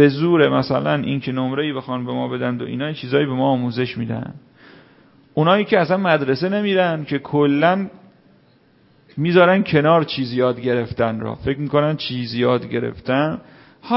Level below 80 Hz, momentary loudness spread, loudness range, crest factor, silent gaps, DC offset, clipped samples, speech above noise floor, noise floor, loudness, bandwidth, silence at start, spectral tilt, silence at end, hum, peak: -52 dBFS; 10 LU; 4 LU; 18 dB; none; under 0.1%; under 0.1%; 36 dB; -55 dBFS; -19 LUFS; 5.8 kHz; 0 s; -11 dB/octave; 0 s; none; 0 dBFS